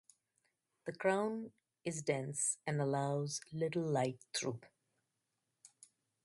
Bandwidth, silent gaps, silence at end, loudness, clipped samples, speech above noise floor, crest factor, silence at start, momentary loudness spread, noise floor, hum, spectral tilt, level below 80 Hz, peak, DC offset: 11.5 kHz; none; 0.6 s; -38 LUFS; under 0.1%; 49 dB; 20 dB; 0.85 s; 11 LU; -87 dBFS; none; -4.5 dB/octave; -80 dBFS; -20 dBFS; under 0.1%